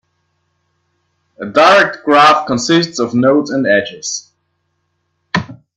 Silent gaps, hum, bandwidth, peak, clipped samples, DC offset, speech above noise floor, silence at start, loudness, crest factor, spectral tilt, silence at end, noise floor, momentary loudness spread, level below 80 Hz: none; none; 11.5 kHz; 0 dBFS; under 0.1%; under 0.1%; 55 dB; 1.4 s; -12 LUFS; 14 dB; -4 dB/octave; 0.25 s; -67 dBFS; 13 LU; -56 dBFS